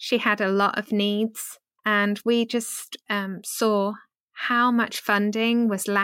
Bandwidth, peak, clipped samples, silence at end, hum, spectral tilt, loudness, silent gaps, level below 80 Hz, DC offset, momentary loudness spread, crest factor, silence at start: 17 kHz; -8 dBFS; under 0.1%; 0 s; none; -4 dB/octave; -23 LUFS; 4.20-4.28 s; -74 dBFS; under 0.1%; 9 LU; 16 dB; 0 s